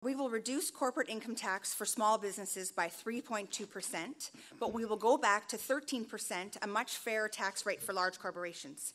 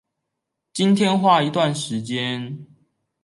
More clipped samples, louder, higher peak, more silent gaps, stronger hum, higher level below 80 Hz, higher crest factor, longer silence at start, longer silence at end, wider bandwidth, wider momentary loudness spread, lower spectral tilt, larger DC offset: neither; second, -36 LUFS vs -20 LUFS; second, -16 dBFS vs -4 dBFS; neither; neither; second, -82 dBFS vs -68 dBFS; about the same, 20 dB vs 18 dB; second, 0 s vs 0.75 s; second, 0 s vs 0.6 s; first, 16 kHz vs 11.5 kHz; second, 10 LU vs 16 LU; second, -2 dB/octave vs -5.5 dB/octave; neither